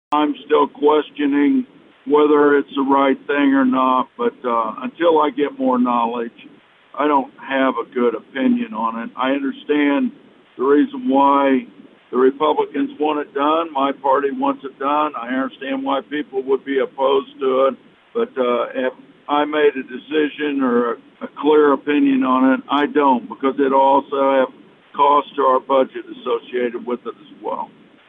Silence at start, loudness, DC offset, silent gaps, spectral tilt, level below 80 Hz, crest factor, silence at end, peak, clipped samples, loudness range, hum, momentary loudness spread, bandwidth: 0.1 s; -18 LUFS; under 0.1%; none; -7.5 dB/octave; -70 dBFS; 14 dB; 0.45 s; -4 dBFS; under 0.1%; 4 LU; none; 10 LU; 3.9 kHz